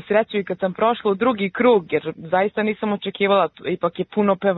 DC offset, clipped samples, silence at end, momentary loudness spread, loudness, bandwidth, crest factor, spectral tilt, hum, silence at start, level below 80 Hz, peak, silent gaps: under 0.1%; under 0.1%; 0 s; 7 LU; -21 LUFS; 4.1 kHz; 16 dB; -10 dB/octave; none; 0.05 s; -62 dBFS; -4 dBFS; none